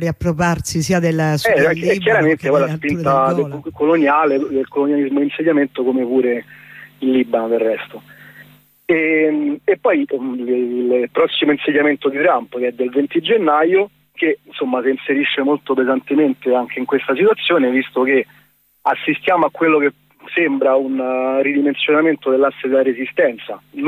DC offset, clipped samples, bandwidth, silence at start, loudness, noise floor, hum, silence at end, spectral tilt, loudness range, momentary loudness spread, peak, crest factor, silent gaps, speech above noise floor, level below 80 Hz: under 0.1%; under 0.1%; 15.5 kHz; 0 s; -16 LUFS; -46 dBFS; none; 0 s; -6 dB/octave; 3 LU; 6 LU; -4 dBFS; 12 dB; none; 30 dB; -50 dBFS